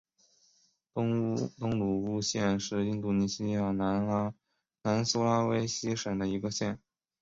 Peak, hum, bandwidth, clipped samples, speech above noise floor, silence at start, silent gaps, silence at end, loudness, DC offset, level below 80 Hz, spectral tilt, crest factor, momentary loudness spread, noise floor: -14 dBFS; none; 7.8 kHz; under 0.1%; 39 dB; 0.95 s; none; 0.45 s; -31 LUFS; under 0.1%; -60 dBFS; -5.5 dB/octave; 18 dB; 6 LU; -69 dBFS